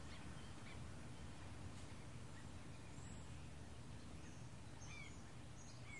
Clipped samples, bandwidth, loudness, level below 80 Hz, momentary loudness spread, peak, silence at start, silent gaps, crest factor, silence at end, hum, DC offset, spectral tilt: under 0.1%; 11.5 kHz; -56 LUFS; -64 dBFS; 2 LU; -42 dBFS; 0 s; none; 12 dB; 0 s; none; 0.1%; -4.5 dB/octave